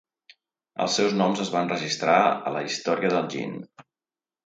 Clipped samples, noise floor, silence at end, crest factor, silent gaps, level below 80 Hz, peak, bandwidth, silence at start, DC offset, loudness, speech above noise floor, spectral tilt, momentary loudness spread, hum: under 0.1%; under -90 dBFS; 0.65 s; 20 dB; none; -72 dBFS; -6 dBFS; 9.4 kHz; 0.8 s; under 0.1%; -24 LUFS; over 66 dB; -4 dB/octave; 12 LU; none